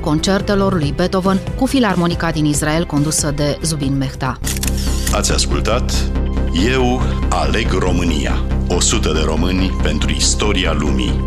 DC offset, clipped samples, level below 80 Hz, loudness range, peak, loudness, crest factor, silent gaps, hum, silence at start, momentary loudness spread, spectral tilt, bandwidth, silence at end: under 0.1%; under 0.1%; -20 dBFS; 1 LU; -2 dBFS; -16 LUFS; 14 dB; none; none; 0 s; 4 LU; -4.5 dB/octave; 14 kHz; 0 s